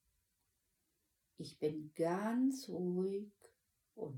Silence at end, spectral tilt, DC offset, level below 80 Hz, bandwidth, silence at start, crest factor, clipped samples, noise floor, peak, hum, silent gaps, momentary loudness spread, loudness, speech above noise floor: 0 s; -6.5 dB/octave; under 0.1%; -84 dBFS; 17 kHz; 1.4 s; 16 dB; under 0.1%; -83 dBFS; -24 dBFS; none; none; 16 LU; -39 LUFS; 45 dB